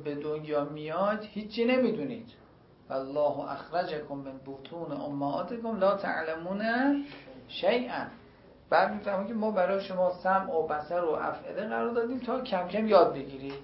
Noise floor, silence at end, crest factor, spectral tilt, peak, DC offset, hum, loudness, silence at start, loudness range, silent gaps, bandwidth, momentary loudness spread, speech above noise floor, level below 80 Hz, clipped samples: -55 dBFS; 0 s; 22 dB; -9.5 dB/octave; -8 dBFS; under 0.1%; none; -30 LUFS; 0 s; 4 LU; none; 5.8 kHz; 12 LU; 25 dB; -64 dBFS; under 0.1%